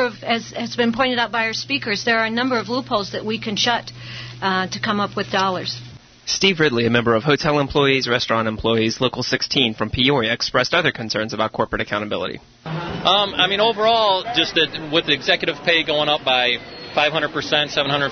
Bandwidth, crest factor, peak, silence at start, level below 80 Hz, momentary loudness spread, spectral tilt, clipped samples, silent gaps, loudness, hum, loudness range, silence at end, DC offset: 6.6 kHz; 18 dB; -2 dBFS; 0 s; -48 dBFS; 8 LU; -4 dB/octave; under 0.1%; none; -19 LUFS; none; 4 LU; 0 s; under 0.1%